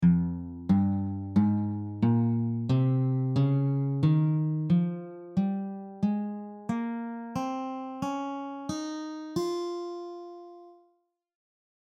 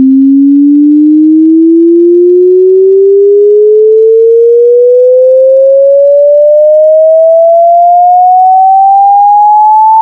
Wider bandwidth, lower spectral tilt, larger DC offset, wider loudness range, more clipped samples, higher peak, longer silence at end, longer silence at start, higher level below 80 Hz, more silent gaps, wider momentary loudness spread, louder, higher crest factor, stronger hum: first, 9.2 kHz vs 1 kHz; about the same, -8.5 dB/octave vs -9.5 dB/octave; neither; first, 9 LU vs 0 LU; second, under 0.1% vs 7%; second, -14 dBFS vs 0 dBFS; first, 1.2 s vs 0 s; about the same, 0 s vs 0 s; first, -60 dBFS vs -80 dBFS; neither; first, 12 LU vs 0 LU; second, -29 LUFS vs -4 LUFS; first, 16 dB vs 2 dB; neither